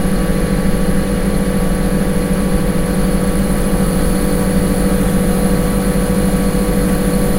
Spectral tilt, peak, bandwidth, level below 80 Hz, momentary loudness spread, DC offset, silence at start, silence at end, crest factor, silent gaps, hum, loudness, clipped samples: -6 dB/octave; 0 dBFS; 16 kHz; -20 dBFS; 2 LU; under 0.1%; 0 s; 0 s; 14 dB; none; none; -16 LUFS; under 0.1%